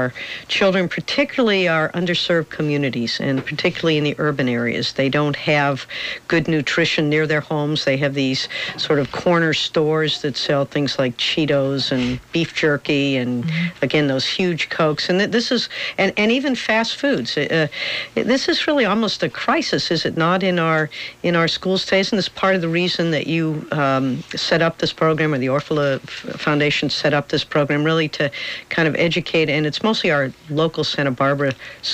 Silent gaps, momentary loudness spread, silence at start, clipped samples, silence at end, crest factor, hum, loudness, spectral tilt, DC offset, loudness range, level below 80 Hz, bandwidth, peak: none; 5 LU; 0 s; under 0.1%; 0 s; 12 dB; none; -19 LUFS; -5 dB/octave; under 0.1%; 1 LU; -52 dBFS; 15 kHz; -6 dBFS